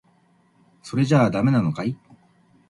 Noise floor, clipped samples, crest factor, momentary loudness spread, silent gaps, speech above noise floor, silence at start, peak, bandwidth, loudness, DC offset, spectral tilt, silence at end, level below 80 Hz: -60 dBFS; under 0.1%; 18 dB; 12 LU; none; 40 dB; 0.85 s; -6 dBFS; 11.5 kHz; -21 LUFS; under 0.1%; -7.5 dB/octave; 0.75 s; -58 dBFS